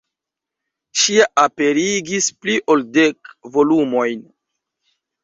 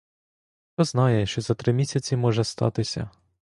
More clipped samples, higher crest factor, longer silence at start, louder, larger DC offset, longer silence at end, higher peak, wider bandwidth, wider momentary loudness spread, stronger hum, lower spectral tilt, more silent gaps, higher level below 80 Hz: neither; about the same, 18 dB vs 18 dB; first, 0.95 s vs 0.8 s; first, -16 LUFS vs -24 LUFS; neither; first, 1.05 s vs 0.4 s; first, 0 dBFS vs -6 dBFS; second, 7.8 kHz vs 11.5 kHz; about the same, 10 LU vs 9 LU; neither; second, -2.5 dB/octave vs -6 dB/octave; neither; second, -62 dBFS vs -52 dBFS